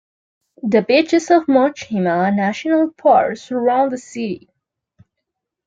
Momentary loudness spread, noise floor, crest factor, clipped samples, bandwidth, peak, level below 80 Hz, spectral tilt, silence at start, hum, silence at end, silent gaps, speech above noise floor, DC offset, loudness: 12 LU; -79 dBFS; 16 dB; under 0.1%; 7.8 kHz; -2 dBFS; -64 dBFS; -6 dB/octave; 0.65 s; none; 1.3 s; none; 63 dB; under 0.1%; -17 LUFS